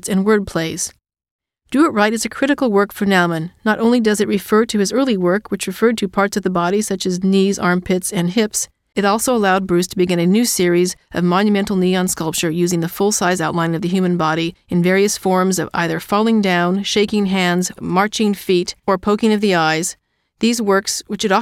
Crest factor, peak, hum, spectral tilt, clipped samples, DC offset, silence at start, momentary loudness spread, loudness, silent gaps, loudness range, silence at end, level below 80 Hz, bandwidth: 14 dB; -4 dBFS; none; -4.5 dB/octave; under 0.1%; under 0.1%; 0.05 s; 5 LU; -17 LUFS; 1.31-1.39 s; 1 LU; 0 s; -50 dBFS; 16.5 kHz